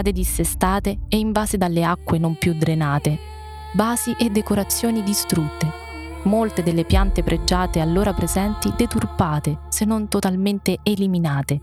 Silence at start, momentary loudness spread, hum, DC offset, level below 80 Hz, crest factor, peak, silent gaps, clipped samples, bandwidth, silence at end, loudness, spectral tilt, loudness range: 0 s; 4 LU; none; under 0.1%; -30 dBFS; 18 dB; -2 dBFS; none; under 0.1%; 16.5 kHz; 0 s; -21 LUFS; -5.5 dB/octave; 1 LU